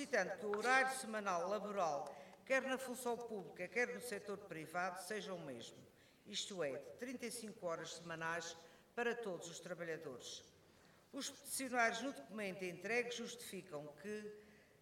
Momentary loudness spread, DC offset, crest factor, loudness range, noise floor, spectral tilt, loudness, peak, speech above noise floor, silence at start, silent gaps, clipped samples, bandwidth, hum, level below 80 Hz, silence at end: 13 LU; under 0.1%; 22 dB; 7 LU; -68 dBFS; -3 dB/octave; -43 LUFS; -22 dBFS; 25 dB; 0 s; none; under 0.1%; 17.5 kHz; none; -84 dBFS; 0.2 s